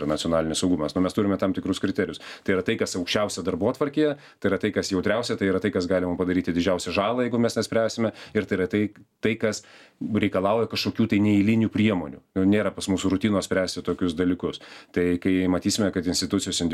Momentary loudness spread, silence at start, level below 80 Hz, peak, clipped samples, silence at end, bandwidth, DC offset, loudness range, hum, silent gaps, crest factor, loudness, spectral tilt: 6 LU; 0 s; -54 dBFS; -8 dBFS; under 0.1%; 0 s; 14.5 kHz; under 0.1%; 3 LU; none; none; 16 dB; -24 LUFS; -5 dB/octave